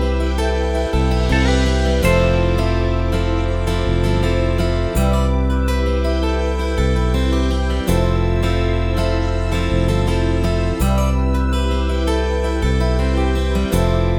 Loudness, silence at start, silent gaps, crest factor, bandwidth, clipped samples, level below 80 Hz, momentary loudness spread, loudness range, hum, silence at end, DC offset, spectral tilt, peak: -18 LUFS; 0 s; none; 14 dB; 18.5 kHz; under 0.1%; -20 dBFS; 3 LU; 1 LU; none; 0 s; under 0.1%; -6.5 dB/octave; -2 dBFS